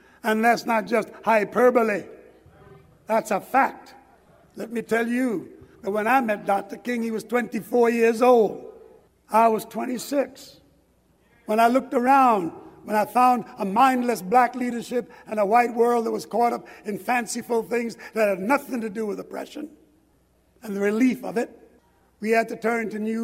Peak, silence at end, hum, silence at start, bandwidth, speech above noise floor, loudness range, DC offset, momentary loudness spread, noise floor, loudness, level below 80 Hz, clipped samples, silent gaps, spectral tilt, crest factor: -6 dBFS; 0 s; none; 0.25 s; 16 kHz; 40 dB; 6 LU; under 0.1%; 13 LU; -62 dBFS; -23 LUFS; -66 dBFS; under 0.1%; none; -5 dB/octave; 18 dB